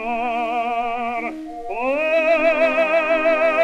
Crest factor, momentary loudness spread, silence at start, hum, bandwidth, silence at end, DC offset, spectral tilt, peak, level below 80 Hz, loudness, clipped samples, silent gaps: 12 dB; 10 LU; 0 s; none; 9.4 kHz; 0 s; under 0.1%; -4 dB/octave; -6 dBFS; -50 dBFS; -19 LUFS; under 0.1%; none